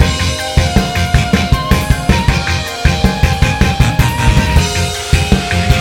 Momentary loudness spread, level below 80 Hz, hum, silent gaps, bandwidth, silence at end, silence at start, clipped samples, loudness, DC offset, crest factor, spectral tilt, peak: 3 LU; -18 dBFS; none; none; 17 kHz; 0 s; 0 s; 1%; -13 LUFS; under 0.1%; 12 dB; -5 dB/octave; 0 dBFS